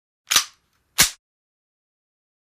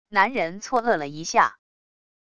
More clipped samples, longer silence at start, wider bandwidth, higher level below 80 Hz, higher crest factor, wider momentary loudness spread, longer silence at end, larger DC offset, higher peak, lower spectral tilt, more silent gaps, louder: neither; first, 0.3 s vs 0.05 s; first, 15.5 kHz vs 11 kHz; first, -52 dBFS vs -62 dBFS; about the same, 24 dB vs 20 dB; first, 11 LU vs 5 LU; first, 1.3 s vs 0.7 s; neither; about the same, -2 dBFS vs -4 dBFS; second, 1 dB/octave vs -3.5 dB/octave; neither; first, -19 LUFS vs -23 LUFS